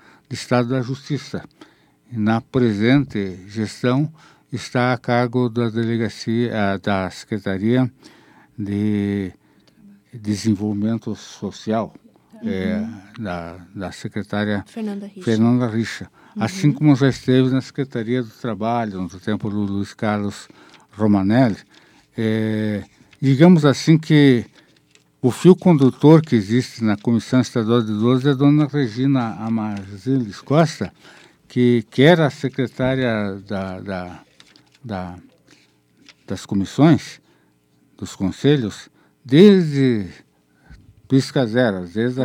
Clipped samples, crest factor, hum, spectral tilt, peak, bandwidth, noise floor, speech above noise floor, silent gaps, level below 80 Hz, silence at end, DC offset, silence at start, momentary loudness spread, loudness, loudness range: under 0.1%; 20 dB; none; -7 dB/octave; 0 dBFS; 14.5 kHz; -59 dBFS; 41 dB; none; -58 dBFS; 0 s; under 0.1%; 0.3 s; 17 LU; -19 LUFS; 9 LU